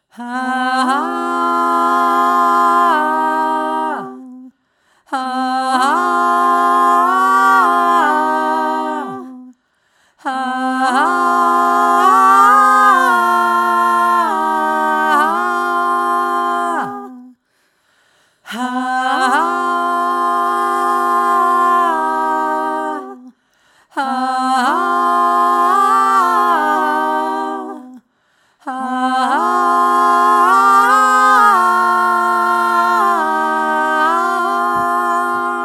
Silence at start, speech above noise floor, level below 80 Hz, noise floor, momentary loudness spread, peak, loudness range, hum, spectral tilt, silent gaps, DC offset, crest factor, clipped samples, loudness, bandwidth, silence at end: 0.2 s; 44 dB; -72 dBFS; -62 dBFS; 12 LU; 0 dBFS; 7 LU; none; -2.5 dB/octave; none; under 0.1%; 14 dB; under 0.1%; -14 LUFS; 17 kHz; 0 s